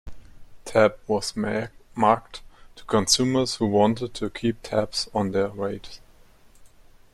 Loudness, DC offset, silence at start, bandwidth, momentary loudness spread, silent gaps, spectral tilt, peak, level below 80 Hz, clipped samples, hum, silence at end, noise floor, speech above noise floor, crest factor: -24 LUFS; under 0.1%; 0.05 s; 14 kHz; 14 LU; none; -4 dB/octave; -4 dBFS; -50 dBFS; under 0.1%; none; 0.45 s; -52 dBFS; 29 dB; 20 dB